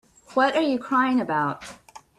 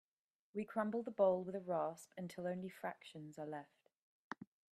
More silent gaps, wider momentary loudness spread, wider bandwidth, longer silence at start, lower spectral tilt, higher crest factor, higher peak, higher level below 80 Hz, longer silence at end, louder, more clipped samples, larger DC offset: second, none vs 3.96-4.30 s; second, 11 LU vs 18 LU; second, 12 kHz vs 14 kHz; second, 0.3 s vs 0.55 s; about the same, -5.5 dB/octave vs -6.5 dB/octave; about the same, 18 dB vs 20 dB; first, -8 dBFS vs -22 dBFS; first, -64 dBFS vs -86 dBFS; about the same, 0.2 s vs 0.3 s; first, -23 LUFS vs -42 LUFS; neither; neither